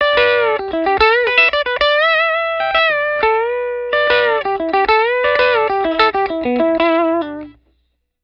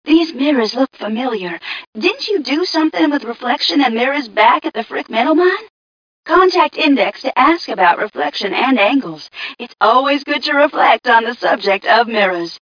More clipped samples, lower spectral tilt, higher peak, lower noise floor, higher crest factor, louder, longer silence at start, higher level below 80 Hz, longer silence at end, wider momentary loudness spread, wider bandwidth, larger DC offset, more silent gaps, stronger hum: neither; about the same, -5 dB/octave vs -4 dB/octave; about the same, 0 dBFS vs 0 dBFS; second, -65 dBFS vs under -90 dBFS; about the same, 14 dB vs 14 dB; about the same, -14 LUFS vs -14 LUFS; about the same, 0 s vs 0.05 s; first, -44 dBFS vs -60 dBFS; first, 0.7 s vs 0.05 s; second, 6 LU vs 9 LU; first, 7 kHz vs 5.4 kHz; neither; second, none vs 1.87-1.93 s, 5.70-6.23 s; neither